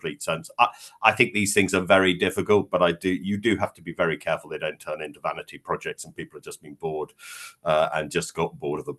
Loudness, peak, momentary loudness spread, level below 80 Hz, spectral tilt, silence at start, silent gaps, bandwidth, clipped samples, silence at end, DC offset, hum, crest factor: -24 LUFS; 0 dBFS; 16 LU; -60 dBFS; -4 dB/octave; 0.05 s; none; 12.5 kHz; under 0.1%; 0.05 s; under 0.1%; none; 24 dB